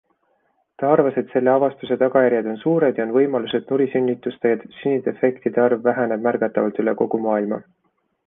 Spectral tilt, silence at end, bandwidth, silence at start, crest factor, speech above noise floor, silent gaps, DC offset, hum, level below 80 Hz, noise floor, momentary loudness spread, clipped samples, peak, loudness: -10 dB/octave; 0.65 s; 3.8 kHz; 0.8 s; 16 dB; 50 dB; none; under 0.1%; none; -66 dBFS; -69 dBFS; 5 LU; under 0.1%; -4 dBFS; -20 LUFS